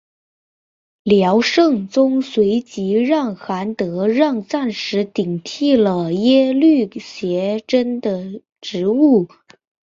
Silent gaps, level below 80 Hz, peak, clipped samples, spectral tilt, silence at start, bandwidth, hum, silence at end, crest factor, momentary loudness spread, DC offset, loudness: 8.52-8.56 s; -60 dBFS; -2 dBFS; under 0.1%; -6 dB/octave; 1.05 s; 7.6 kHz; none; 0.65 s; 16 dB; 10 LU; under 0.1%; -17 LUFS